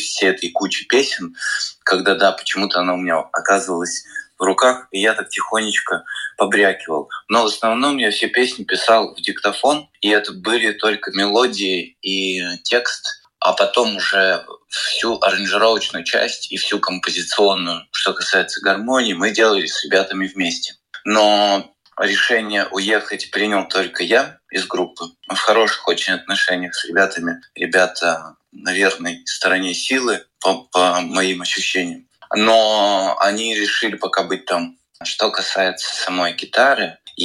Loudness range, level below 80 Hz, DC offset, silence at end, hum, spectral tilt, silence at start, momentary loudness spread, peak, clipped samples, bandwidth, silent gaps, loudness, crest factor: 2 LU; -66 dBFS; under 0.1%; 0 s; none; -2 dB/octave; 0 s; 8 LU; -2 dBFS; under 0.1%; 14.5 kHz; none; -17 LUFS; 16 dB